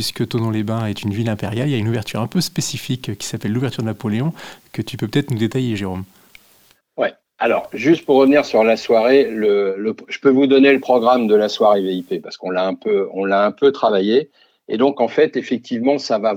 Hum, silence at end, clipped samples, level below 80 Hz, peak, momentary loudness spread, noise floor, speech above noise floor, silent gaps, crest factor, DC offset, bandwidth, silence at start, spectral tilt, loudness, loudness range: none; 0 s; under 0.1%; -60 dBFS; 0 dBFS; 11 LU; -55 dBFS; 37 dB; none; 16 dB; under 0.1%; 16.5 kHz; 0 s; -6 dB/octave; -18 LUFS; 8 LU